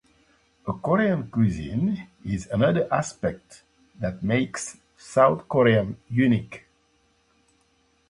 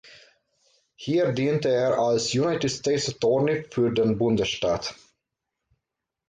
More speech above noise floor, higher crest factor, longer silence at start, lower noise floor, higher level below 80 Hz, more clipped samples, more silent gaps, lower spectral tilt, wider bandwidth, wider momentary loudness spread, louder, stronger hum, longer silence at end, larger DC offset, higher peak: second, 42 dB vs 61 dB; first, 22 dB vs 14 dB; second, 0.65 s vs 1 s; second, -65 dBFS vs -85 dBFS; first, -50 dBFS vs -56 dBFS; neither; neither; first, -6.5 dB/octave vs -5 dB/octave; first, 11.5 kHz vs 9.4 kHz; first, 14 LU vs 4 LU; about the same, -24 LUFS vs -24 LUFS; neither; first, 1.5 s vs 1.35 s; neither; first, -4 dBFS vs -12 dBFS